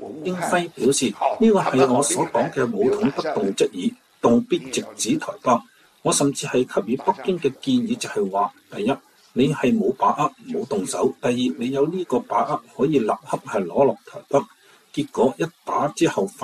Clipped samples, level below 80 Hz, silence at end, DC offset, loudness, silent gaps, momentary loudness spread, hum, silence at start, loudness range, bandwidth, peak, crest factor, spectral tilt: under 0.1%; -60 dBFS; 0 s; under 0.1%; -22 LUFS; none; 7 LU; none; 0 s; 3 LU; 14 kHz; -4 dBFS; 18 dB; -4.5 dB/octave